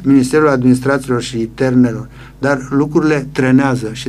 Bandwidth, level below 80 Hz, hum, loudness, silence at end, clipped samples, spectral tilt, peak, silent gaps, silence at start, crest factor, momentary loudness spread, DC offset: 12.5 kHz; -40 dBFS; none; -14 LUFS; 0 s; under 0.1%; -6.5 dB/octave; 0 dBFS; none; 0 s; 14 dB; 8 LU; under 0.1%